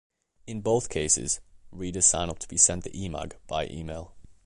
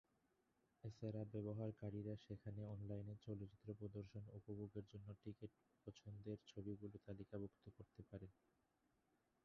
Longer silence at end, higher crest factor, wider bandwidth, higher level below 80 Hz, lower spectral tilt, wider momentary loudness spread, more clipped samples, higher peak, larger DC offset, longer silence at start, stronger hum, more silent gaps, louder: second, 0.15 s vs 1.15 s; first, 24 dB vs 18 dB; first, 11.5 kHz vs 6.6 kHz; first, -46 dBFS vs -74 dBFS; second, -3 dB/octave vs -9 dB/octave; first, 17 LU vs 10 LU; neither; first, -6 dBFS vs -38 dBFS; neither; second, 0.45 s vs 0.85 s; neither; neither; first, -25 LUFS vs -54 LUFS